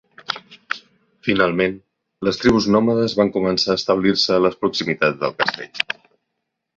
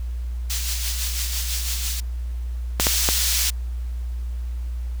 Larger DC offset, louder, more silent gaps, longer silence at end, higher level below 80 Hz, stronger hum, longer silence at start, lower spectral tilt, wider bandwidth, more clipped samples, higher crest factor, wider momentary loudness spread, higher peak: neither; first, -19 LUFS vs -24 LUFS; neither; first, 0.85 s vs 0 s; second, -50 dBFS vs -28 dBFS; neither; first, 0.3 s vs 0 s; first, -5 dB/octave vs -1.5 dB/octave; second, 7.8 kHz vs over 20 kHz; neither; about the same, 20 dB vs 24 dB; about the same, 13 LU vs 13 LU; about the same, 0 dBFS vs 0 dBFS